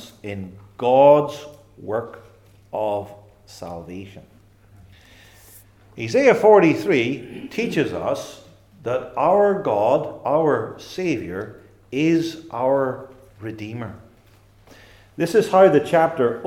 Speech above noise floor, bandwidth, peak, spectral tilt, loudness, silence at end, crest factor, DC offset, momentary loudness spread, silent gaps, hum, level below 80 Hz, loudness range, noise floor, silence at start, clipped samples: 33 dB; 16 kHz; 0 dBFS; -6.5 dB/octave; -19 LUFS; 0 s; 20 dB; under 0.1%; 21 LU; none; none; -58 dBFS; 12 LU; -52 dBFS; 0 s; under 0.1%